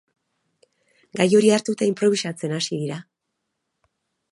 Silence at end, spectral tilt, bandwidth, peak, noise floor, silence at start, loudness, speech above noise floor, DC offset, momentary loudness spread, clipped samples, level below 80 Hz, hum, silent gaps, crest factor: 1.3 s; -5 dB/octave; 11.5 kHz; -2 dBFS; -79 dBFS; 1.15 s; -21 LUFS; 58 dB; under 0.1%; 14 LU; under 0.1%; -72 dBFS; none; none; 20 dB